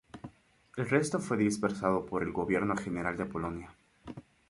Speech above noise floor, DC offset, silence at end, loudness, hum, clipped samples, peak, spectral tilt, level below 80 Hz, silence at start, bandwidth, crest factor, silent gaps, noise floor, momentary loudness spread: 27 dB; under 0.1%; 0.3 s; -32 LUFS; none; under 0.1%; -12 dBFS; -6 dB/octave; -58 dBFS; 0.15 s; 11.5 kHz; 20 dB; none; -58 dBFS; 19 LU